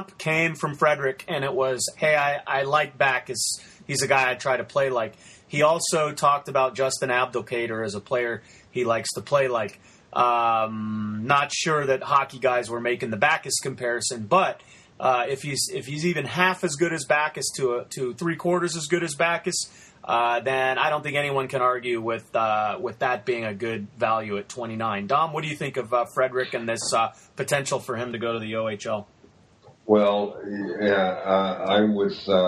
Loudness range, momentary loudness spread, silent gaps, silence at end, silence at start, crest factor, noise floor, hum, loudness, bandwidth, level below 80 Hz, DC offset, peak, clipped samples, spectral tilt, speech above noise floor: 3 LU; 8 LU; none; 0 s; 0 s; 20 dB; -55 dBFS; none; -24 LUFS; 13.5 kHz; -66 dBFS; under 0.1%; -4 dBFS; under 0.1%; -3.5 dB/octave; 31 dB